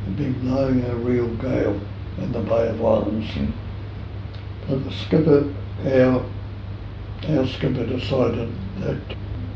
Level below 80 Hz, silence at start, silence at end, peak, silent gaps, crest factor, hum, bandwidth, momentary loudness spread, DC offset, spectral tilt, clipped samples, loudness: -36 dBFS; 0 s; 0 s; -4 dBFS; none; 18 dB; none; 6.8 kHz; 15 LU; under 0.1%; -9 dB/octave; under 0.1%; -23 LUFS